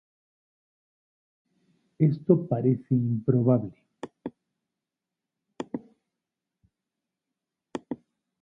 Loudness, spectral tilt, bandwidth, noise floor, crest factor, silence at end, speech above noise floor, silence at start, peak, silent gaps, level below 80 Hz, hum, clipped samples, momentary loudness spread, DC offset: -26 LUFS; -11 dB/octave; 7.6 kHz; -88 dBFS; 24 dB; 0.45 s; 64 dB; 2 s; -8 dBFS; none; -66 dBFS; none; under 0.1%; 19 LU; under 0.1%